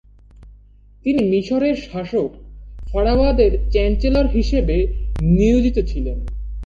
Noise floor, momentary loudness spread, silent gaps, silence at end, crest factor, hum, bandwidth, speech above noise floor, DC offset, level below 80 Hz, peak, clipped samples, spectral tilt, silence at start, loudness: -46 dBFS; 11 LU; none; 0 s; 16 dB; none; 7.2 kHz; 30 dB; under 0.1%; -22 dBFS; -2 dBFS; under 0.1%; -8 dB/octave; 0.4 s; -19 LUFS